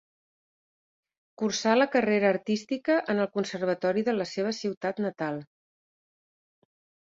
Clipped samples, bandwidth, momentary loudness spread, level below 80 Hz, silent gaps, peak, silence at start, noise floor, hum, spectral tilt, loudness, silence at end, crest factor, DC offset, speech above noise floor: under 0.1%; 7.8 kHz; 8 LU; -74 dBFS; 4.77-4.81 s; -10 dBFS; 1.4 s; under -90 dBFS; none; -5 dB/octave; -27 LUFS; 1.6 s; 20 dB; under 0.1%; over 63 dB